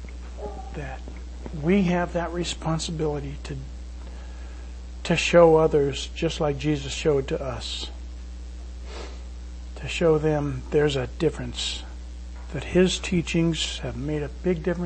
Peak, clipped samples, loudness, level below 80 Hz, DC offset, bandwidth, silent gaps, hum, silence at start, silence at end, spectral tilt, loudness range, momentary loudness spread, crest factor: -4 dBFS; under 0.1%; -24 LUFS; -36 dBFS; under 0.1%; 8.8 kHz; none; none; 0 s; 0 s; -5.5 dB/octave; 7 LU; 18 LU; 22 dB